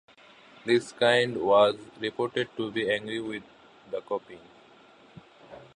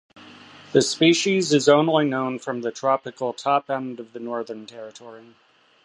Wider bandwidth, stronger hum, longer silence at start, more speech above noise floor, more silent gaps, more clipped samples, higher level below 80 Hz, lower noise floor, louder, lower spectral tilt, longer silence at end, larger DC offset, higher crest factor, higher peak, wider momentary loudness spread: about the same, 10.5 kHz vs 11.5 kHz; neither; first, 0.65 s vs 0.15 s; first, 29 dB vs 24 dB; neither; neither; about the same, -70 dBFS vs -72 dBFS; first, -55 dBFS vs -46 dBFS; second, -27 LUFS vs -21 LUFS; about the same, -4.5 dB/octave vs -4.5 dB/octave; second, 0.1 s vs 0.65 s; neither; about the same, 22 dB vs 20 dB; second, -8 dBFS vs -2 dBFS; about the same, 16 LU vs 18 LU